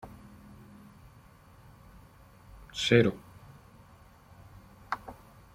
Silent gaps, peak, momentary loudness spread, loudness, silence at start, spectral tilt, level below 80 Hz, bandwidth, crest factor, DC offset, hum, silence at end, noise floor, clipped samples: none; -6 dBFS; 30 LU; -28 LUFS; 0.05 s; -5.5 dB/octave; -58 dBFS; 15.5 kHz; 28 dB; under 0.1%; none; 0.4 s; -56 dBFS; under 0.1%